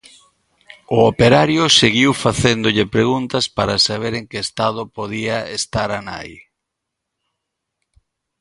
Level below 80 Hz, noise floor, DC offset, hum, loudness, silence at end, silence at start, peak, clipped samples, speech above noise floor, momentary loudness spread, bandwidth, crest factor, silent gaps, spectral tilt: -44 dBFS; -79 dBFS; under 0.1%; none; -16 LUFS; 2 s; 0.9 s; 0 dBFS; under 0.1%; 62 dB; 14 LU; 11.5 kHz; 18 dB; none; -4 dB/octave